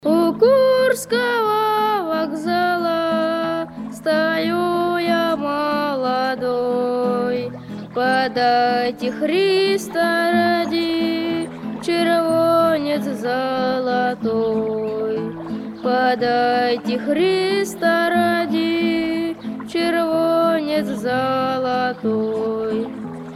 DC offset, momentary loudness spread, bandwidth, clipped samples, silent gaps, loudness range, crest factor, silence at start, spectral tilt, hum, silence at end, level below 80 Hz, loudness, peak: under 0.1%; 7 LU; 15.5 kHz; under 0.1%; none; 2 LU; 16 dB; 0.05 s; -5 dB/octave; none; 0 s; -58 dBFS; -19 LUFS; -4 dBFS